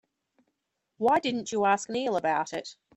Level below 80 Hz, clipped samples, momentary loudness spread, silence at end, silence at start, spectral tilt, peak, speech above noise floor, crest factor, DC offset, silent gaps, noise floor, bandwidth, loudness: -72 dBFS; under 0.1%; 6 LU; 0.25 s; 1 s; -3.5 dB/octave; -10 dBFS; 53 dB; 18 dB; under 0.1%; none; -81 dBFS; 11 kHz; -27 LUFS